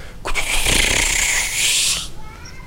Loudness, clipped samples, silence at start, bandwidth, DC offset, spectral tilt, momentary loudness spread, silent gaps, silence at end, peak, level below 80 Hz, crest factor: -16 LUFS; under 0.1%; 0 s; 16 kHz; under 0.1%; -0.5 dB/octave; 10 LU; none; 0 s; -2 dBFS; -28 dBFS; 16 dB